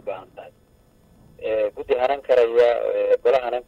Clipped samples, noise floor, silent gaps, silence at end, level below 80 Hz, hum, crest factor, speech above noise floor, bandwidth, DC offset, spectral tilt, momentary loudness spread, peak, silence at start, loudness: under 0.1%; -56 dBFS; none; 0.05 s; -56 dBFS; none; 14 dB; 35 dB; 7 kHz; under 0.1%; -5 dB/octave; 14 LU; -8 dBFS; 0.05 s; -20 LUFS